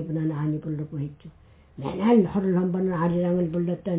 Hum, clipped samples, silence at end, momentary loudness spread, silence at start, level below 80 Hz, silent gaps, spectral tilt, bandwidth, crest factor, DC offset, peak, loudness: none; under 0.1%; 0 s; 13 LU; 0 s; -54 dBFS; none; -12.5 dB/octave; 4 kHz; 18 dB; under 0.1%; -8 dBFS; -25 LUFS